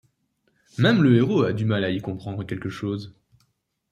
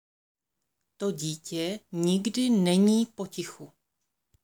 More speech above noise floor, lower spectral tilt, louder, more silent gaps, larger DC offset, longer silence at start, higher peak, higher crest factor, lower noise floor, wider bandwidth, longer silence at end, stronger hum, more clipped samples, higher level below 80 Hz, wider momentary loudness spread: second, 49 dB vs 56 dB; first, -8 dB/octave vs -5.5 dB/octave; first, -23 LUFS vs -27 LUFS; neither; neither; second, 0.8 s vs 1 s; first, -6 dBFS vs -12 dBFS; about the same, 18 dB vs 16 dB; second, -71 dBFS vs -83 dBFS; second, 9.4 kHz vs over 20 kHz; about the same, 0.8 s vs 0.75 s; neither; neither; first, -60 dBFS vs -76 dBFS; about the same, 15 LU vs 14 LU